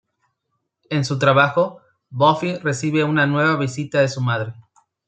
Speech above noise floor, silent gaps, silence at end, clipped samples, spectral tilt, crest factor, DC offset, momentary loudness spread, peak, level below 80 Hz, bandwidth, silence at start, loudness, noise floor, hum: 56 dB; none; 0.45 s; under 0.1%; -6 dB/octave; 20 dB; under 0.1%; 9 LU; 0 dBFS; -64 dBFS; 9.2 kHz; 0.9 s; -19 LUFS; -75 dBFS; none